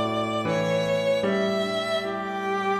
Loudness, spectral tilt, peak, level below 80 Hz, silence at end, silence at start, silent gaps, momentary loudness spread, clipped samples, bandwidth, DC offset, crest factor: -25 LUFS; -5.5 dB/octave; -14 dBFS; -62 dBFS; 0 s; 0 s; none; 4 LU; under 0.1%; 15 kHz; under 0.1%; 12 dB